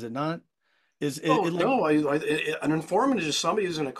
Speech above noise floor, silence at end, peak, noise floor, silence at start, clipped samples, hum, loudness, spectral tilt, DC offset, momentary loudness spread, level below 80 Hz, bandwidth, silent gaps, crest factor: 30 dB; 0 s; -10 dBFS; -55 dBFS; 0 s; under 0.1%; none; -26 LUFS; -4.5 dB/octave; under 0.1%; 8 LU; -68 dBFS; 13.5 kHz; none; 16 dB